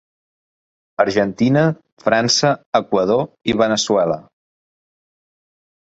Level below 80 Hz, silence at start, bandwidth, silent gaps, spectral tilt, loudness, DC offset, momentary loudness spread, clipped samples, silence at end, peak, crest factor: -54 dBFS; 1 s; 8.2 kHz; 1.92-1.97 s, 2.66-2.72 s; -4.5 dB/octave; -17 LUFS; under 0.1%; 6 LU; under 0.1%; 1.65 s; -2 dBFS; 18 dB